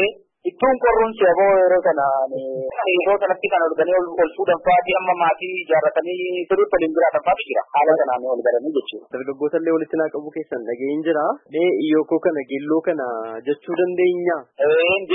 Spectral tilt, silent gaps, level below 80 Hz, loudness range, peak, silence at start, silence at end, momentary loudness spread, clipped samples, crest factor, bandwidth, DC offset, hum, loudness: -10 dB/octave; none; -54 dBFS; 4 LU; -4 dBFS; 0 s; 0 s; 9 LU; under 0.1%; 14 dB; 3.9 kHz; under 0.1%; none; -19 LUFS